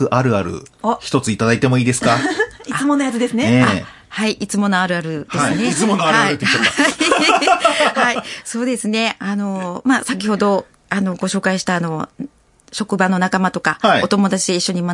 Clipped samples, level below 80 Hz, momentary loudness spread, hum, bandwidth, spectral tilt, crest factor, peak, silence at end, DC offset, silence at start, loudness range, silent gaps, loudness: under 0.1%; -54 dBFS; 10 LU; none; 11.5 kHz; -4.5 dB/octave; 16 dB; 0 dBFS; 0 s; under 0.1%; 0 s; 5 LU; none; -16 LUFS